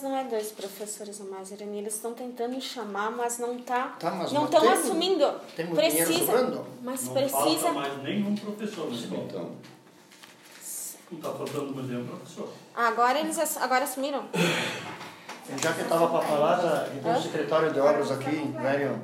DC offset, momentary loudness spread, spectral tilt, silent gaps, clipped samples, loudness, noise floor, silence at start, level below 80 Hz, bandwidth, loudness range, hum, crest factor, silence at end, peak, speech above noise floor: under 0.1%; 15 LU; -3.5 dB/octave; none; under 0.1%; -28 LUFS; -52 dBFS; 0 s; -84 dBFS; 16 kHz; 11 LU; none; 20 dB; 0 s; -8 dBFS; 25 dB